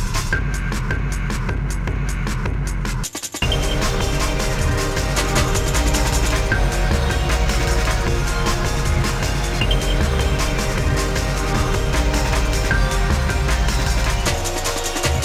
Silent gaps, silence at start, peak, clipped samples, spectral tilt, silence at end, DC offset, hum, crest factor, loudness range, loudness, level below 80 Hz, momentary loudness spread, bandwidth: none; 0 s; -4 dBFS; under 0.1%; -4 dB/octave; 0 s; under 0.1%; none; 14 dB; 3 LU; -20 LUFS; -22 dBFS; 5 LU; 16 kHz